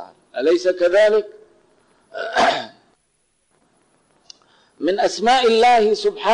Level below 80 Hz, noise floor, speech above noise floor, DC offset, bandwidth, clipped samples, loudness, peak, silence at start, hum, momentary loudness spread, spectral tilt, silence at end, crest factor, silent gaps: -58 dBFS; -66 dBFS; 50 dB; under 0.1%; 11 kHz; under 0.1%; -17 LUFS; -10 dBFS; 0 s; none; 18 LU; -3 dB/octave; 0 s; 10 dB; none